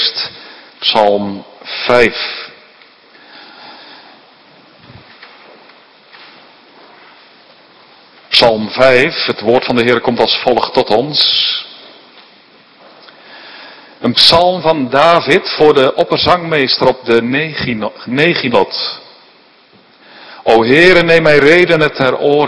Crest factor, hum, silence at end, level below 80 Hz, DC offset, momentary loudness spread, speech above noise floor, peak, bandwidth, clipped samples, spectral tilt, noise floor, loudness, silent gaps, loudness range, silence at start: 14 dB; none; 0 s; -46 dBFS; under 0.1%; 14 LU; 35 dB; 0 dBFS; 11 kHz; 0.7%; -5 dB/octave; -46 dBFS; -11 LUFS; none; 7 LU; 0 s